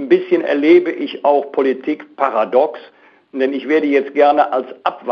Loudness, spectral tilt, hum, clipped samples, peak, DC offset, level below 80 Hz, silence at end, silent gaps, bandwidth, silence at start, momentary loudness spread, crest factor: -16 LUFS; -6.5 dB/octave; none; under 0.1%; 0 dBFS; under 0.1%; -70 dBFS; 0 s; none; 6.2 kHz; 0 s; 10 LU; 16 dB